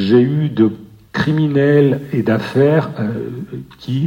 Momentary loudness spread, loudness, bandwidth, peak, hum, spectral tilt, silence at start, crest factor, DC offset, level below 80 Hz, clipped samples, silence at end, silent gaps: 15 LU; -16 LUFS; 16 kHz; 0 dBFS; none; -8.5 dB/octave; 0 s; 14 dB; under 0.1%; -52 dBFS; under 0.1%; 0 s; none